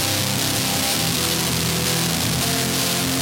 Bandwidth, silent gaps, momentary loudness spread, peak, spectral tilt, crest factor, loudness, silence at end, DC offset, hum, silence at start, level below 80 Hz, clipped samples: 17 kHz; none; 1 LU; -6 dBFS; -2.5 dB/octave; 14 dB; -19 LUFS; 0 s; under 0.1%; none; 0 s; -44 dBFS; under 0.1%